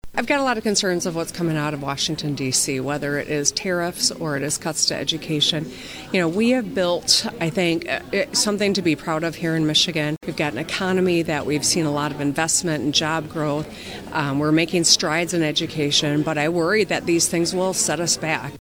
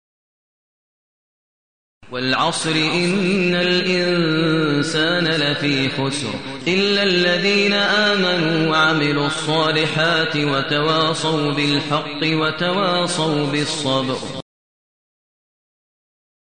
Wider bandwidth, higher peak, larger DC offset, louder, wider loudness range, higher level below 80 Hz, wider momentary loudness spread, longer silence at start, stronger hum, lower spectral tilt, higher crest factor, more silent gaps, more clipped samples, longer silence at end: first, over 20 kHz vs 10 kHz; first, -2 dBFS vs -6 dBFS; second, under 0.1% vs 0.7%; second, -21 LUFS vs -18 LUFS; about the same, 3 LU vs 5 LU; about the same, -52 dBFS vs -56 dBFS; about the same, 7 LU vs 5 LU; second, 0.05 s vs 2.1 s; neither; second, -3 dB/octave vs -4.5 dB/octave; first, 20 dB vs 14 dB; neither; neither; second, 0 s vs 2.1 s